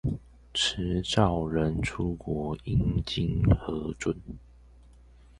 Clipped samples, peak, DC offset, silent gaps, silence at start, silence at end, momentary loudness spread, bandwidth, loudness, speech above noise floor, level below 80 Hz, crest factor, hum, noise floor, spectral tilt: under 0.1%; -8 dBFS; under 0.1%; none; 0.05 s; 1 s; 9 LU; 11.5 kHz; -29 LUFS; 26 dB; -40 dBFS; 22 dB; 60 Hz at -45 dBFS; -54 dBFS; -5.5 dB/octave